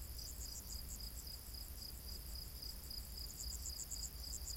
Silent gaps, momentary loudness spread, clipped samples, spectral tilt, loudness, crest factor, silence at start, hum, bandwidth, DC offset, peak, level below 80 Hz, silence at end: none; 4 LU; under 0.1%; -2 dB/octave; -47 LUFS; 16 dB; 0 s; none; 17 kHz; under 0.1%; -32 dBFS; -52 dBFS; 0 s